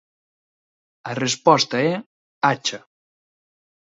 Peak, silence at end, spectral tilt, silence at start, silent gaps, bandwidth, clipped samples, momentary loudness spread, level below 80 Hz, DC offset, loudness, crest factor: 0 dBFS; 1.15 s; -3.5 dB/octave; 1.05 s; 2.06-2.41 s; 8 kHz; under 0.1%; 15 LU; -68 dBFS; under 0.1%; -20 LUFS; 24 dB